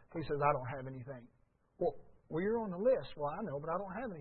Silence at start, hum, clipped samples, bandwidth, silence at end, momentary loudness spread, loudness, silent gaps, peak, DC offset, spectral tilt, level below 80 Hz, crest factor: 0.1 s; none; under 0.1%; 4.3 kHz; 0 s; 12 LU; -37 LUFS; none; -18 dBFS; under 0.1%; -6.5 dB/octave; -62 dBFS; 20 dB